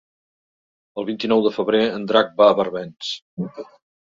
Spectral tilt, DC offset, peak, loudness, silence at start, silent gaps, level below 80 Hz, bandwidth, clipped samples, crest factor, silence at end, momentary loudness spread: -5.5 dB/octave; under 0.1%; -2 dBFS; -20 LUFS; 0.95 s; 3.22-3.37 s; -64 dBFS; 7.6 kHz; under 0.1%; 20 dB; 0.55 s; 15 LU